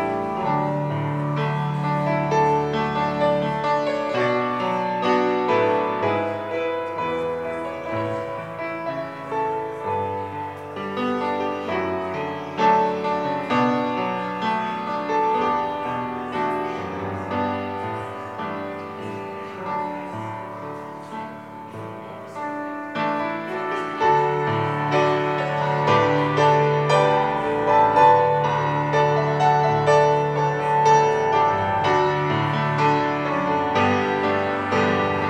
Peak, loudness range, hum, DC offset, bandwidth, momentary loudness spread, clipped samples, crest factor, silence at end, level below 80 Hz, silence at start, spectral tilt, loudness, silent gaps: -4 dBFS; 11 LU; none; under 0.1%; 10.5 kHz; 13 LU; under 0.1%; 18 dB; 0 s; -58 dBFS; 0 s; -6.5 dB/octave; -22 LUFS; none